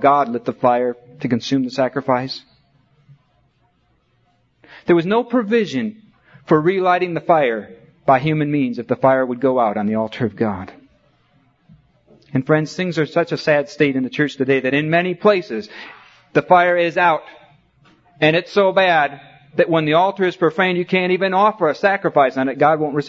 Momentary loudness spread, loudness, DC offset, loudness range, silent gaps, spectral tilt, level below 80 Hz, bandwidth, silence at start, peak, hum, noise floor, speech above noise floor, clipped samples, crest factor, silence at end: 9 LU; -18 LUFS; under 0.1%; 7 LU; none; -6.5 dB/octave; -62 dBFS; 7.6 kHz; 0 s; 0 dBFS; none; -62 dBFS; 45 dB; under 0.1%; 18 dB; 0 s